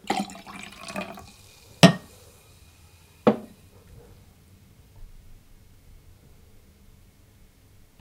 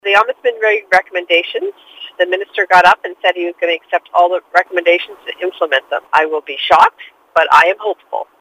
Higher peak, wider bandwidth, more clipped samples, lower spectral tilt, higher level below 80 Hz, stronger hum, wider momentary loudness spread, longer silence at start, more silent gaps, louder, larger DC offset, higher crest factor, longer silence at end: about the same, 0 dBFS vs 0 dBFS; first, 17.5 kHz vs 15.5 kHz; second, under 0.1% vs 0.2%; first, -5.5 dB/octave vs -2.5 dB/octave; about the same, -54 dBFS vs -56 dBFS; neither; first, 29 LU vs 13 LU; about the same, 0.1 s vs 0.05 s; neither; second, -24 LUFS vs -13 LUFS; neither; first, 30 dB vs 14 dB; first, 2.95 s vs 0.15 s